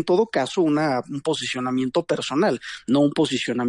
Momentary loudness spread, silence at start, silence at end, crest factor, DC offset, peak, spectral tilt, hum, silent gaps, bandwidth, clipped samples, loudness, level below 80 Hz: 5 LU; 0 s; 0 s; 14 dB; under 0.1%; -8 dBFS; -5 dB/octave; none; none; 11 kHz; under 0.1%; -22 LUFS; -64 dBFS